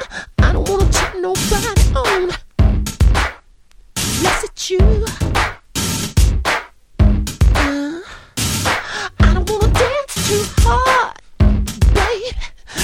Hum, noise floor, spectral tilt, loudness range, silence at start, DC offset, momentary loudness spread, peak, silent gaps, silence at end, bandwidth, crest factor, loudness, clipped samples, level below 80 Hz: none; -45 dBFS; -4.5 dB/octave; 2 LU; 0 s; under 0.1%; 8 LU; 0 dBFS; none; 0 s; 19.5 kHz; 16 dB; -17 LUFS; under 0.1%; -18 dBFS